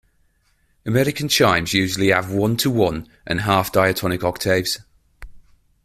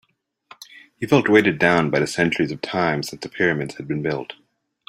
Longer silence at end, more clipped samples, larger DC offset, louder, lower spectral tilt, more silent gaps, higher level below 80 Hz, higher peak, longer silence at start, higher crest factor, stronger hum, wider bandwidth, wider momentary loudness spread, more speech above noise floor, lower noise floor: about the same, 0.5 s vs 0.55 s; neither; neither; about the same, -19 LUFS vs -20 LUFS; about the same, -4.5 dB/octave vs -5.5 dB/octave; neither; first, -46 dBFS vs -58 dBFS; about the same, -2 dBFS vs -2 dBFS; first, 0.85 s vs 0.6 s; about the same, 18 dB vs 20 dB; neither; about the same, 16 kHz vs 15.5 kHz; second, 9 LU vs 13 LU; first, 43 dB vs 31 dB; first, -62 dBFS vs -51 dBFS